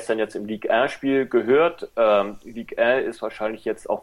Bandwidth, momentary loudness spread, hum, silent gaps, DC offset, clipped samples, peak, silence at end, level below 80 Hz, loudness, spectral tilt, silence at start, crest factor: 12 kHz; 10 LU; none; none; under 0.1%; under 0.1%; -8 dBFS; 0 s; -58 dBFS; -22 LUFS; -5.5 dB/octave; 0 s; 14 dB